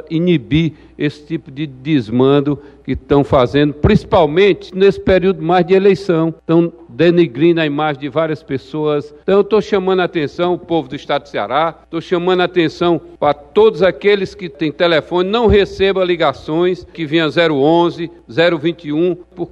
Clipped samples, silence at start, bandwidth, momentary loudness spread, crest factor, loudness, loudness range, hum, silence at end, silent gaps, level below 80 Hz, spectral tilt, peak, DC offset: under 0.1%; 0.05 s; 8 kHz; 10 LU; 14 dB; -15 LUFS; 4 LU; none; 0.05 s; none; -36 dBFS; -7.5 dB/octave; 0 dBFS; under 0.1%